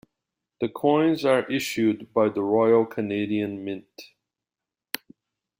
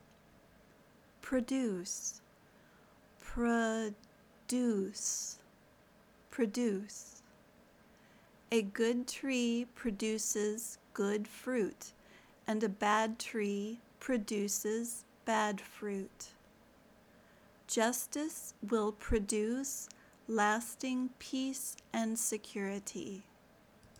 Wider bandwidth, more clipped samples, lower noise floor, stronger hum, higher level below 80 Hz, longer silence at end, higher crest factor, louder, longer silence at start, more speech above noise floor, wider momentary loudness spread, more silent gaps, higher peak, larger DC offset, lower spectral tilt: second, 16.5 kHz vs over 20 kHz; neither; first, -89 dBFS vs -64 dBFS; neither; second, -68 dBFS vs -58 dBFS; first, 1.55 s vs 0.1 s; about the same, 18 dB vs 20 dB; first, -23 LUFS vs -36 LUFS; second, 0.6 s vs 1.2 s; first, 66 dB vs 28 dB; about the same, 14 LU vs 14 LU; neither; first, -6 dBFS vs -18 dBFS; neither; first, -5.5 dB/octave vs -3.5 dB/octave